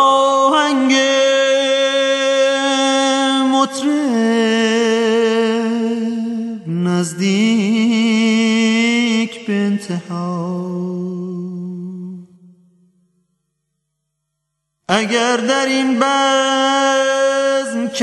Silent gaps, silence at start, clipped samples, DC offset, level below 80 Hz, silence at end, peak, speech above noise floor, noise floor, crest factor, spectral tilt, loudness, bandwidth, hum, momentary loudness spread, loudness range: none; 0 s; under 0.1%; under 0.1%; -70 dBFS; 0 s; 0 dBFS; 59 dB; -74 dBFS; 16 dB; -4 dB/octave; -15 LUFS; 12 kHz; none; 10 LU; 12 LU